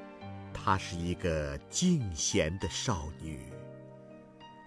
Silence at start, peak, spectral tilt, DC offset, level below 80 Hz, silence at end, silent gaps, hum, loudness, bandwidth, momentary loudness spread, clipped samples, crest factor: 0 s; -14 dBFS; -4.5 dB/octave; under 0.1%; -50 dBFS; 0 s; none; none; -33 LUFS; 11 kHz; 21 LU; under 0.1%; 20 dB